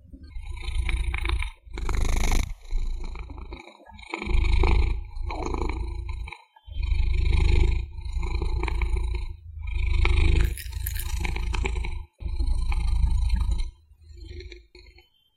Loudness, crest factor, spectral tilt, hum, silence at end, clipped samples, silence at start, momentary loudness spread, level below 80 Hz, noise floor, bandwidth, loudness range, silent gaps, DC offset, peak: -29 LUFS; 22 dB; -5.5 dB/octave; none; 0.55 s; under 0.1%; 0.1 s; 18 LU; -26 dBFS; -55 dBFS; 15.5 kHz; 3 LU; none; under 0.1%; -4 dBFS